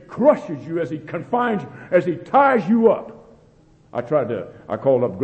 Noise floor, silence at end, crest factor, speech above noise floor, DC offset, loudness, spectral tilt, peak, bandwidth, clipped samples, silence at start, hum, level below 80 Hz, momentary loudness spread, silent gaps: -52 dBFS; 0 s; 18 dB; 33 dB; under 0.1%; -20 LUFS; -8.5 dB/octave; -2 dBFS; 8.2 kHz; under 0.1%; 0.1 s; none; -60 dBFS; 13 LU; none